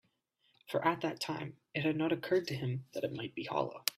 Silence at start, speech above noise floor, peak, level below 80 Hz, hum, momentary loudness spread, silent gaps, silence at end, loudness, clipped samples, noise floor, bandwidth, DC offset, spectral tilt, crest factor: 0.7 s; 40 dB; -8 dBFS; -76 dBFS; none; 7 LU; none; 0.05 s; -36 LUFS; under 0.1%; -76 dBFS; 15.5 kHz; under 0.1%; -5 dB/octave; 28 dB